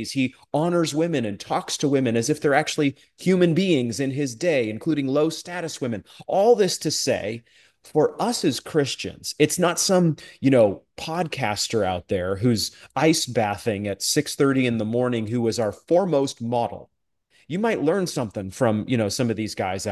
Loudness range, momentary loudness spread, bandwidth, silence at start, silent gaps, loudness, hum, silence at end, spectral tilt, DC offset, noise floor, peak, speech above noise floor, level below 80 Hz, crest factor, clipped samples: 2 LU; 9 LU; 12.5 kHz; 0 s; none; -23 LUFS; none; 0 s; -5 dB/octave; under 0.1%; -63 dBFS; -4 dBFS; 41 dB; -54 dBFS; 18 dB; under 0.1%